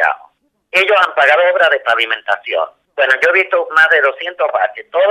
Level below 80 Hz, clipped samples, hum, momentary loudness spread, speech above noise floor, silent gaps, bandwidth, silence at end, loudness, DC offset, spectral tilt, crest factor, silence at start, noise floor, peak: -68 dBFS; under 0.1%; none; 8 LU; 37 dB; none; 13.5 kHz; 0 s; -13 LUFS; under 0.1%; -1.5 dB/octave; 14 dB; 0 s; -50 dBFS; 0 dBFS